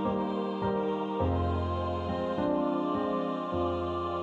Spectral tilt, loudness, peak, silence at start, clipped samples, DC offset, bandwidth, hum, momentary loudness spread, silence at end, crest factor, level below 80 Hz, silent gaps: -9 dB/octave; -31 LUFS; -18 dBFS; 0 s; under 0.1%; under 0.1%; 7.4 kHz; none; 3 LU; 0 s; 12 dB; -48 dBFS; none